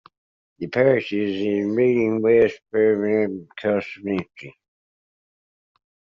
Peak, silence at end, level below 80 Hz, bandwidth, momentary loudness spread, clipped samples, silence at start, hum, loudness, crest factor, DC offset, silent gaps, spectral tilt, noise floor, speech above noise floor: -4 dBFS; 1.65 s; -62 dBFS; 7 kHz; 9 LU; under 0.1%; 0.6 s; none; -21 LUFS; 18 dB; under 0.1%; none; -6 dB/octave; under -90 dBFS; over 69 dB